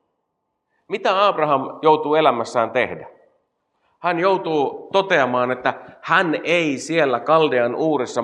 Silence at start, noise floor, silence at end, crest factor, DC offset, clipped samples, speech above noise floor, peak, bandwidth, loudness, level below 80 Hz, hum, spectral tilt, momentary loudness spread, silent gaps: 0.9 s; -75 dBFS; 0 s; 18 dB; under 0.1%; under 0.1%; 56 dB; -2 dBFS; 10.5 kHz; -19 LUFS; -74 dBFS; none; -5 dB/octave; 7 LU; none